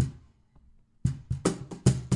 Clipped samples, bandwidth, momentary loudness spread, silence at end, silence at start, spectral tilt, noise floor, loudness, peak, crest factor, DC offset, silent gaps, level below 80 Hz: under 0.1%; 11.5 kHz; 6 LU; 0 s; 0 s; -6.5 dB/octave; -59 dBFS; -30 LUFS; -8 dBFS; 22 dB; under 0.1%; none; -46 dBFS